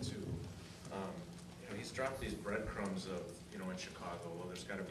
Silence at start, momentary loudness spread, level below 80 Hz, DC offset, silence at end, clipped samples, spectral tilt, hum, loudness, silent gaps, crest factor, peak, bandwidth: 0 s; 9 LU; -60 dBFS; under 0.1%; 0 s; under 0.1%; -5 dB/octave; none; -45 LUFS; none; 18 dB; -26 dBFS; 13.5 kHz